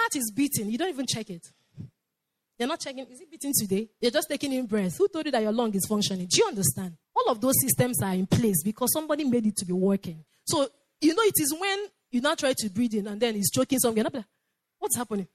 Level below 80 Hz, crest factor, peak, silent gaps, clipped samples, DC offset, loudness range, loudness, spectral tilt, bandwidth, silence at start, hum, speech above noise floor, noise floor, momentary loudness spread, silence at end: -62 dBFS; 18 dB; -10 dBFS; none; under 0.1%; under 0.1%; 6 LU; -26 LUFS; -4 dB/octave; 16 kHz; 0 s; none; 56 dB; -83 dBFS; 10 LU; 0.1 s